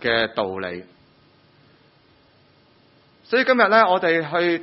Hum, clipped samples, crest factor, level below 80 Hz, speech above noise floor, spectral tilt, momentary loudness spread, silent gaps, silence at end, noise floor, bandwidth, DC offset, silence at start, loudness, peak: none; under 0.1%; 20 dB; -60 dBFS; 37 dB; -8 dB/octave; 15 LU; none; 0 s; -56 dBFS; 6 kHz; under 0.1%; 0 s; -19 LUFS; -2 dBFS